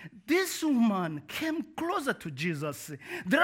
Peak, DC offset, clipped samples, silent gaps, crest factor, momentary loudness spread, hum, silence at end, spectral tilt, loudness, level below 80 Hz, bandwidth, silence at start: -12 dBFS; under 0.1%; under 0.1%; none; 18 dB; 10 LU; none; 0 s; -4.5 dB/octave; -31 LUFS; -70 dBFS; 17 kHz; 0 s